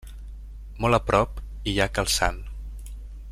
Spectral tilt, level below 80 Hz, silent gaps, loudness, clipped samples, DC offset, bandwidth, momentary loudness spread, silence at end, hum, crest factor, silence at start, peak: -4 dB/octave; -36 dBFS; none; -24 LUFS; under 0.1%; under 0.1%; 15 kHz; 21 LU; 0 s; none; 22 dB; 0 s; -6 dBFS